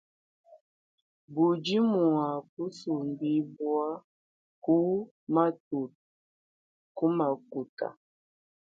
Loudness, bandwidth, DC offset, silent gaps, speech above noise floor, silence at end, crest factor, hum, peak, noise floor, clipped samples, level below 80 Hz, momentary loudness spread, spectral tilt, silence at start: -30 LUFS; 7.4 kHz; under 0.1%; 0.61-1.28 s, 2.49-2.57 s, 4.04-4.62 s, 5.11-5.27 s, 5.60-5.71 s, 5.95-6.95 s, 7.69-7.77 s; over 61 dB; 0.8 s; 20 dB; none; -10 dBFS; under -90 dBFS; under 0.1%; -78 dBFS; 12 LU; -7.5 dB/octave; 0.5 s